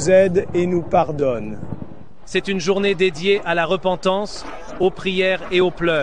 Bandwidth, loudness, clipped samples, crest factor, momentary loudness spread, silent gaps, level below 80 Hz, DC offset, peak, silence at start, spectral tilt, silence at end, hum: 10 kHz; -19 LUFS; under 0.1%; 16 dB; 14 LU; none; -44 dBFS; 2%; -4 dBFS; 0 s; -5 dB/octave; 0 s; none